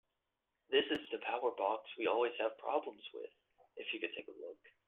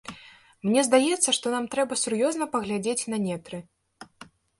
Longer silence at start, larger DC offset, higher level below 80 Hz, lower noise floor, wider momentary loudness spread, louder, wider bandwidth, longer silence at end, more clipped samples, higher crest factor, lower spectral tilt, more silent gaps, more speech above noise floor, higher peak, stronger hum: first, 0.7 s vs 0.05 s; neither; second, -82 dBFS vs -68 dBFS; first, -87 dBFS vs -52 dBFS; about the same, 16 LU vs 14 LU; second, -38 LUFS vs -25 LUFS; second, 6.2 kHz vs 11.5 kHz; second, 0.2 s vs 0.35 s; neither; about the same, 20 dB vs 20 dB; first, -5 dB/octave vs -3 dB/octave; neither; first, 49 dB vs 27 dB; second, -18 dBFS vs -6 dBFS; neither